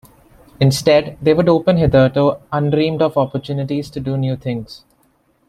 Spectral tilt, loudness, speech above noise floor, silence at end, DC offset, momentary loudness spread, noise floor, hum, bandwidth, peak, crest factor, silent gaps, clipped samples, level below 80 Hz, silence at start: -7 dB/octave; -16 LUFS; 43 dB; 0.7 s; under 0.1%; 10 LU; -59 dBFS; none; 14.5 kHz; -2 dBFS; 14 dB; none; under 0.1%; -40 dBFS; 0.6 s